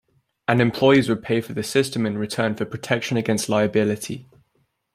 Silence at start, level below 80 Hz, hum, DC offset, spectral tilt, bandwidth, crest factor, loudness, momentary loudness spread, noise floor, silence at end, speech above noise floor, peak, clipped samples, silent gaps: 0.5 s; -58 dBFS; none; under 0.1%; -5.5 dB/octave; 15.5 kHz; 20 dB; -21 LUFS; 12 LU; -68 dBFS; 0.7 s; 47 dB; -2 dBFS; under 0.1%; none